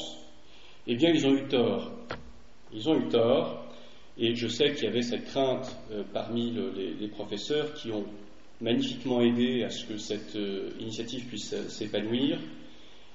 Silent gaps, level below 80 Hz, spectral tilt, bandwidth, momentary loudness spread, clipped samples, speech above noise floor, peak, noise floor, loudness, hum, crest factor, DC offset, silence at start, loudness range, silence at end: none; -62 dBFS; -4 dB/octave; 8 kHz; 16 LU; under 0.1%; 26 dB; -12 dBFS; -55 dBFS; -30 LUFS; none; 18 dB; 0.6%; 0 s; 5 LU; 0.25 s